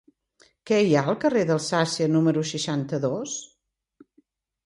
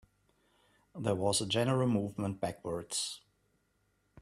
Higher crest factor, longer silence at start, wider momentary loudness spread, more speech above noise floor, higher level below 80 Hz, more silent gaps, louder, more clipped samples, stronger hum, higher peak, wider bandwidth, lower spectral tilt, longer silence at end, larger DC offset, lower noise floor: about the same, 18 dB vs 18 dB; second, 0.65 s vs 0.95 s; second, 7 LU vs 10 LU; about the same, 42 dB vs 43 dB; about the same, -68 dBFS vs -68 dBFS; neither; first, -24 LUFS vs -33 LUFS; neither; neither; first, -6 dBFS vs -18 dBFS; second, 11.5 kHz vs 13.5 kHz; about the same, -5 dB/octave vs -4.5 dB/octave; first, 1.2 s vs 1.05 s; neither; second, -65 dBFS vs -76 dBFS